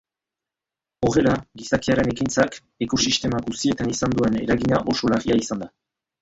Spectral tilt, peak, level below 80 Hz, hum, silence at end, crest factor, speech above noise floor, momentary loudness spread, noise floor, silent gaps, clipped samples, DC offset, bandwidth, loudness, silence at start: -4.5 dB/octave; -4 dBFS; -46 dBFS; none; 0.55 s; 20 dB; 67 dB; 6 LU; -88 dBFS; none; under 0.1%; under 0.1%; 8 kHz; -22 LUFS; 1 s